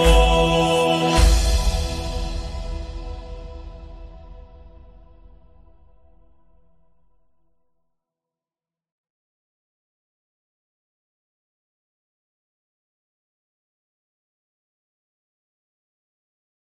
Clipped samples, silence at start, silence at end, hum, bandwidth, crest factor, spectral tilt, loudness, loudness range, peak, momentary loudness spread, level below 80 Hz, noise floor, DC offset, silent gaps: under 0.1%; 0 s; 12.2 s; none; 13.5 kHz; 22 dB; -4.5 dB/octave; -20 LUFS; 25 LU; -2 dBFS; 24 LU; -28 dBFS; under -90 dBFS; under 0.1%; none